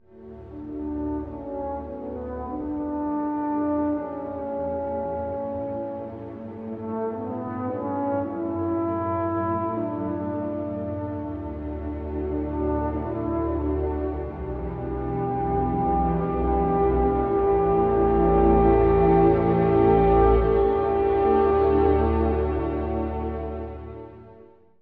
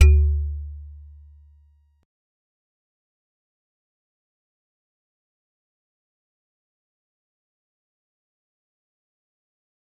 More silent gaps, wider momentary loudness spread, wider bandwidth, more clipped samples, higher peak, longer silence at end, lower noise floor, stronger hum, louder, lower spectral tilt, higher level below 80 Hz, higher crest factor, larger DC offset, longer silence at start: neither; second, 14 LU vs 26 LU; second, 4.5 kHz vs 5.8 kHz; neither; second, -8 dBFS vs -2 dBFS; second, 0.4 s vs 9.1 s; second, -51 dBFS vs -58 dBFS; neither; about the same, -24 LUFS vs -22 LUFS; first, -11.5 dB/octave vs -7.5 dB/octave; about the same, -34 dBFS vs -30 dBFS; second, 16 dB vs 26 dB; neither; first, 0.15 s vs 0 s